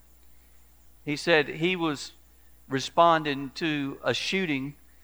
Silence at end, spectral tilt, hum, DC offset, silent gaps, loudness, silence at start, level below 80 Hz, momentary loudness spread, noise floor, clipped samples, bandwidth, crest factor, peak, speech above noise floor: 0.3 s; -4.5 dB/octave; 60 Hz at -60 dBFS; 0.1%; none; -26 LUFS; 1.05 s; -60 dBFS; 14 LU; -57 dBFS; under 0.1%; over 20 kHz; 22 dB; -6 dBFS; 31 dB